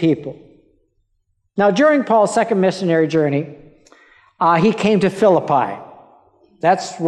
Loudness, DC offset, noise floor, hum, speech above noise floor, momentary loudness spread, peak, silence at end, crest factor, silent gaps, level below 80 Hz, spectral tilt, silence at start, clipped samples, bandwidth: -16 LUFS; under 0.1%; -67 dBFS; none; 51 dB; 10 LU; -4 dBFS; 0 s; 14 dB; none; -60 dBFS; -6 dB/octave; 0 s; under 0.1%; 11.5 kHz